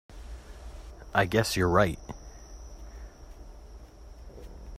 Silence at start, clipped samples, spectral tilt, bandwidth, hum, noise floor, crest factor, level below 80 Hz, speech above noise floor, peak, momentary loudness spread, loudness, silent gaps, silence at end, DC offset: 0.1 s; under 0.1%; -5 dB/octave; 16 kHz; none; -47 dBFS; 22 dB; -44 dBFS; 22 dB; -10 dBFS; 25 LU; -26 LUFS; none; 0.05 s; under 0.1%